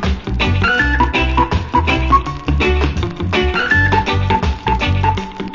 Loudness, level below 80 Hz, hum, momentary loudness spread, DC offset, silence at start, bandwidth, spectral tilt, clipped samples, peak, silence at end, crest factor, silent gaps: -15 LUFS; -20 dBFS; none; 5 LU; under 0.1%; 0 s; 7.6 kHz; -6 dB/octave; under 0.1%; 0 dBFS; 0 s; 14 dB; none